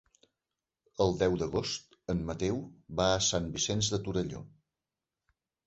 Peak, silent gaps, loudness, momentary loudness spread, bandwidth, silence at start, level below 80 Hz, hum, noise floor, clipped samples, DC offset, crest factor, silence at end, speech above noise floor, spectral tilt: -12 dBFS; none; -32 LUFS; 11 LU; 8.2 kHz; 1 s; -52 dBFS; none; under -90 dBFS; under 0.1%; under 0.1%; 22 dB; 1.2 s; over 59 dB; -4 dB/octave